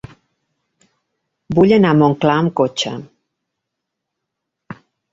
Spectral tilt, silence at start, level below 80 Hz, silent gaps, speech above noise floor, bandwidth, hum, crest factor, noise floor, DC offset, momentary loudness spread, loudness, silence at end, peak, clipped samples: -6.5 dB/octave; 1.5 s; -52 dBFS; none; 65 dB; 7.8 kHz; none; 18 dB; -79 dBFS; under 0.1%; 11 LU; -15 LUFS; 0.4 s; -2 dBFS; under 0.1%